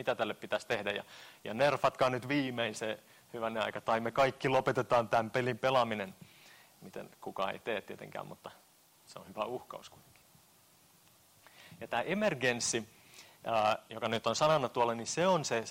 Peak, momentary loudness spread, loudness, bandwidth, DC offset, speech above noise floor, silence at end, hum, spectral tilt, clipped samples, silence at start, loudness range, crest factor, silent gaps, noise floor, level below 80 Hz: -18 dBFS; 19 LU; -33 LUFS; 16 kHz; under 0.1%; 31 dB; 0 s; none; -4 dB/octave; under 0.1%; 0 s; 12 LU; 16 dB; none; -64 dBFS; -70 dBFS